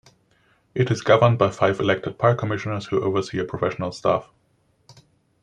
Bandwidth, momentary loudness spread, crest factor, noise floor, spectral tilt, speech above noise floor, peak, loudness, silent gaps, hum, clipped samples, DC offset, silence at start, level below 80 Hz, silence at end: 9.8 kHz; 9 LU; 20 dB; -64 dBFS; -6.5 dB/octave; 43 dB; -2 dBFS; -22 LUFS; none; none; under 0.1%; under 0.1%; 0.75 s; -58 dBFS; 0.5 s